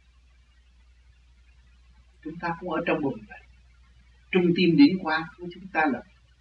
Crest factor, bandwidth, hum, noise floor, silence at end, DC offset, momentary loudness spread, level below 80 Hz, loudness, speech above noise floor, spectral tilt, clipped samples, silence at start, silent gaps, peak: 20 dB; 5.8 kHz; 60 Hz at -55 dBFS; -58 dBFS; 0.4 s; under 0.1%; 22 LU; -56 dBFS; -24 LUFS; 33 dB; -8 dB/octave; under 0.1%; 2.25 s; none; -8 dBFS